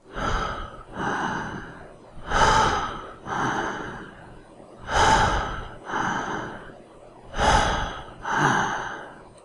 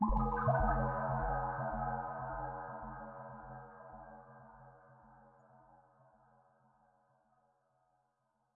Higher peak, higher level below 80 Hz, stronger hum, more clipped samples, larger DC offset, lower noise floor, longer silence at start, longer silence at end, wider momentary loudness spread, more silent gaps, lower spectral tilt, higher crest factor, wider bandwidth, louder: first, -6 dBFS vs -20 dBFS; first, -36 dBFS vs -48 dBFS; neither; neither; neither; second, -47 dBFS vs -81 dBFS; about the same, 0.05 s vs 0 s; second, 0.05 s vs 2.8 s; about the same, 22 LU vs 24 LU; neither; second, -3.5 dB/octave vs -9.5 dB/octave; about the same, 20 dB vs 20 dB; first, 11.5 kHz vs 2.9 kHz; first, -24 LUFS vs -38 LUFS